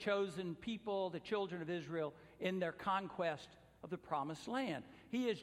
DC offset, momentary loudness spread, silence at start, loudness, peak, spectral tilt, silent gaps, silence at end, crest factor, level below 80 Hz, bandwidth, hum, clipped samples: under 0.1%; 9 LU; 0 s; -42 LUFS; -24 dBFS; -6 dB/octave; none; 0 s; 18 dB; -74 dBFS; 15 kHz; none; under 0.1%